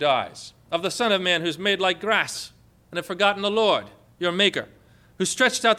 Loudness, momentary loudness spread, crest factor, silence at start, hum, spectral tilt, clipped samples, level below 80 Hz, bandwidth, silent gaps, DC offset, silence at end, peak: -23 LUFS; 13 LU; 18 dB; 0 s; none; -2.5 dB/octave; under 0.1%; -64 dBFS; 15.5 kHz; none; under 0.1%; 0 s; -6 dBFS